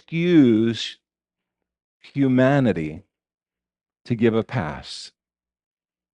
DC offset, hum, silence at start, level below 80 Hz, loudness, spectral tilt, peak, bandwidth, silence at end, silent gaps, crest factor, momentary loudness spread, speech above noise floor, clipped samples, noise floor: under 0.1%; none; 0.1 s; -56 dBFS; -20 LUFS; -7 dB/octave; -4 dBFS; 10 kHz; 1.05 s; 1.84-2.00 s; 18 dB; 17 LU; 67 dB; under 0.1%; -87 dBFS